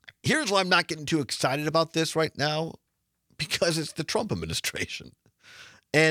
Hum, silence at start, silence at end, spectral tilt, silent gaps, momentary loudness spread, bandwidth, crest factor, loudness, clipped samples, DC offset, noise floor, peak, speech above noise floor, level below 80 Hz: none; 0.25 s; 0 s; -3.5 dB/octave; none; 9 LU; 18 kHz; 20 dB; -26 LUFS; under 0.1%; under 0.1%; -73 dBFS; -6 dBFS; 46 dB; -60 dBFS